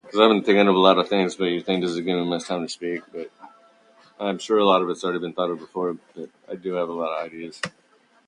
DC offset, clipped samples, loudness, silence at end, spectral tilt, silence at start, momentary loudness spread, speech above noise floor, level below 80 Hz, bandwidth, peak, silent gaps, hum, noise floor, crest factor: under 0.1%; under 0.1%; -22 LUFS; 0.6 s; -5 dB/octave; 0.05 s; 17 LU; 33 dB; -70 dBFS; 10.5 kHz; 0 dBFS; none; none; -55 dBFS; 22 dB